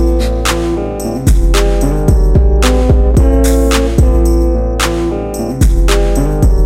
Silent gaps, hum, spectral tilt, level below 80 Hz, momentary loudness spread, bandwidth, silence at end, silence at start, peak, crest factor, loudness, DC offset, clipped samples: none; none; -6 dB/octave; -12 dBFS; 6 LU; 15.5 kHz; 0 s; 0 s; 0 dBFS; 10 dB; -12 LUFS; under 0.1%; under 0.1%